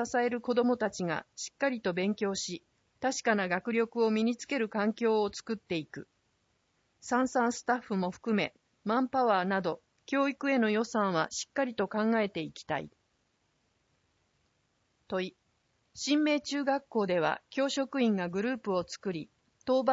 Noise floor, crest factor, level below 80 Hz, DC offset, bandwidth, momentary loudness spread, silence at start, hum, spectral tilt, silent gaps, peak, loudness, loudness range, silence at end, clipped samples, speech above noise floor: -75 dBFS; 18 dB; -72 dBFS; under 0.1%; 8 kHz; 10 LU; 0 s; none; -4.5 dB/octave; none; -14 dBFS; -31 LUFS; 5 LU; 0 s; under 0.1%; 45 dB